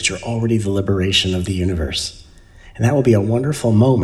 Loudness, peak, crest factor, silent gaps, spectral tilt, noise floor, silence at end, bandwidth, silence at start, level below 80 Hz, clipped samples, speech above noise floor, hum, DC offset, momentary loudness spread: -18 LUFS; -2 dBFS; 16 dB; none; -5.5 dB/octave; -43 dBFS; 0 s; 13.5 kHz; 0 s; -38 dBFS; under 0.1%; 26 dB; none; under 0.1%; 7 LU